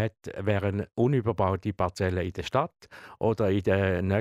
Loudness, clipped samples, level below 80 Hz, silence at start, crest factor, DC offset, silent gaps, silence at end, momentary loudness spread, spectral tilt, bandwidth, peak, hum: -28 LUFS; under 0.1%; -52 dBFS; 0 s; 16 dB; under 0.1%; none; 0 s; 6 LU; -7.5 dB/octave; 11 kHz; -10 dBFS; none